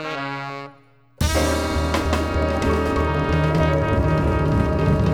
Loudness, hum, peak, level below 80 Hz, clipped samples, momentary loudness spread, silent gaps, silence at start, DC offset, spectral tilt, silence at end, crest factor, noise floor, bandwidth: -21 LUFS; none; -6 dBFS; -28 dBFS; under 0.1%; 9 LU; none; 0 s; 0.1%; -6 dB/octave; 0 s; 14 dB; -52 dBFS; 17 kHz